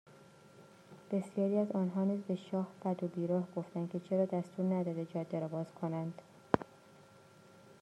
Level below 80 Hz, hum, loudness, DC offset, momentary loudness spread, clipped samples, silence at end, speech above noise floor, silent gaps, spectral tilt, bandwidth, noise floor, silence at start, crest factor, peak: -76 dBFS; none; -37 LUFS; under 0.1%; 7 LU; under 0.1%; 0.1 s; 24 dB; none; -9 dB/octave; 9.6 kHz; -60 dBFS; 0.1 s; 28 dB; -8 dBFS